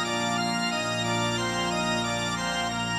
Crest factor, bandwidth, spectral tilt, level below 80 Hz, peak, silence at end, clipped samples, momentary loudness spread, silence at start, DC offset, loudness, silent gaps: 14 dB; 16 kHz; -3.5 dB/octave; -52 dBFS; -14 dBFS; 0 s; under 0.1%; 1 LU; 0 s; under 0.1%; -26 LUFS; none